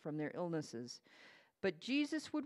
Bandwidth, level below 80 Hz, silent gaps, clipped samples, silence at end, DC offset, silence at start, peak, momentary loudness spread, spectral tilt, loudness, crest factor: 12 kHz; -86 dBFS; none; under 0.1%; 0 s; under 0.1%; 0.05 s; -24 dBFS; 17 LU; -5 dB/octave; -41 LUFS; 18 dB